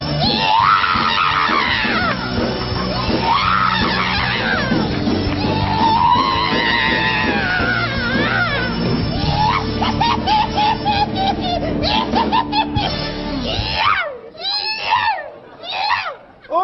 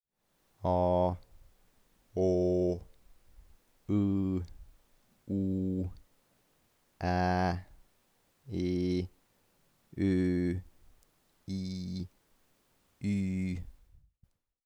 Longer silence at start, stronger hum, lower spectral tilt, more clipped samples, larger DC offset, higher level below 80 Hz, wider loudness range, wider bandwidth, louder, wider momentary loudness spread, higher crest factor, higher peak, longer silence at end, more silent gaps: second, 0 s vs 0.6 s; neither; second, -6 dB/octave vs -8 dB/octave; neither; neither; first, -34 dBFS vs -56 dBFS; second, 3 LU vs 6 LU; second, 6.2 kHz vs 10.5 kHz; first, -17 LUFS vs -33 LUFS; second, 6 LU vs 13 LU; about the same, 14 dB vs 16 dB; first, -2 dBFS vs -18 dBFS; second, 0 s vs 0.95 s; neither